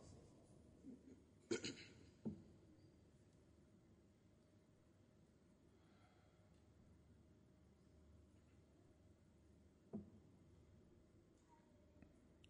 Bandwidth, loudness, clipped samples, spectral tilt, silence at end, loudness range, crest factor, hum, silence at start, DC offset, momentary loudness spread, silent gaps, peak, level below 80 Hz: 10.5 kHz; -54 LUFS; under 0.1%; -4.5 dB/octave; 0 s; 9 LU; 30 dB; none; 0 s; under 0.1%; 20 LU; none; -32 dBFS; -78 dBFS